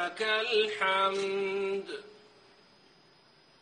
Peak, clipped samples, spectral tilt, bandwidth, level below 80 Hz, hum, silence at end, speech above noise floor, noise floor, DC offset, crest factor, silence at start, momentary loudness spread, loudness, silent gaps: -14 dBFS; under 0.1%; -3 dB/octave; 10 kHz; -78 dBFS; none; 1.45 s; 31 dB; -62 dBFS; under 0.1%; 18 dB; 0 s; 11 LU; -29 LUFS; none